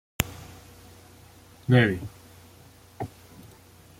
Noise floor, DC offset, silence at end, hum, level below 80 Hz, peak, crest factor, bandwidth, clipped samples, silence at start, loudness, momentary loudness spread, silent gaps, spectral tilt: -52 dBFS; under 0.1%; 0.9 s; none; -52 dBFS; -2 dBFS; 28 dB; 16.5 kHz; under 0.1%; 0.2 s; -26 LUFS; 28 LU; none; -5.5 dB/octave